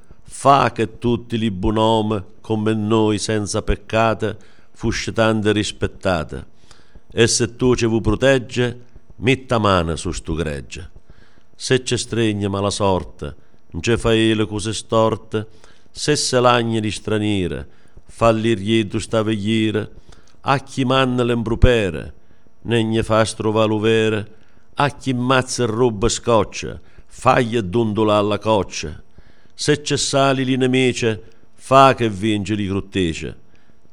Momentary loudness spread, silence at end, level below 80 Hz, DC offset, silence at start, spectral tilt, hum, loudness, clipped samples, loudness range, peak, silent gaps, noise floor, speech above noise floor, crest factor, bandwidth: 12 LU; 0.6 s; -34 dBFS; 1%; 0.3 s; -5 dB/octave; none; -19 LUFS; under 0.1%; 3 LU; 0 dBFS; none; -55 dBFS; 36 dB; 18 dB; 12 kHz